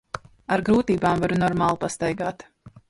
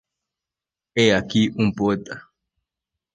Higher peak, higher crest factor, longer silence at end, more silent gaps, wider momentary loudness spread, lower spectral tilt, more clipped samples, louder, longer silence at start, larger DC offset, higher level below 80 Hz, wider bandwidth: second, -8 dBFS vs -4 dBFS; second, 14 dB vs 20 dB; second, 0.2 s vs 0.95 s; neither; about the same, 14 LU vs 15 LU; about the same, -6 dB/octave vs -5.5 dB/octave; neither; about the same, -23 LUFS vs -21 LUFS; second, 0.15 s vs 0.95 s; neither; first, -48 dBFS vs -54 dBFS; first, 11.5 kHz vs 9.4 kHz